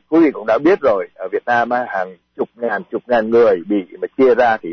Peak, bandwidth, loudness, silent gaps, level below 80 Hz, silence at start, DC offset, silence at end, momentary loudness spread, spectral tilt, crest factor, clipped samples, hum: -4 dBFS; 6.4 kHz; -16 LUFS; none; -56 dBFS; 0.1 s; under 0.1%; 0 s; 11 LU; -7 dB/octave; 12 dB; under 0.1%; none